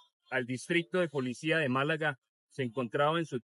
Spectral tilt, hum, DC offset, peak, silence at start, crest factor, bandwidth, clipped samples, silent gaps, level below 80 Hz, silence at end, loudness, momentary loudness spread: -5.5 dB/octave; none; under 0.1%; -16 dBFS; 0.3 s; 16 dB; 11.5 kHz; under 0.1%; 2.18-2.22 s, 2.29-2.49 s; -88 dBFS; 0.05 s; -32 LUFS; 8 LU